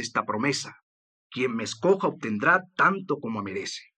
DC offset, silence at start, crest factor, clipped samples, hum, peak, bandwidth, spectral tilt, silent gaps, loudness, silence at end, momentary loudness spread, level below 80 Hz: under 0.1%; 0 s; 20 dB; under 0.1%; none; -6 dBFS; 10 kHz; -4.5 dB/octave; 0.83-1.30 s; -26 LUFS; 0.15 s; 10 LU; -76 dBFS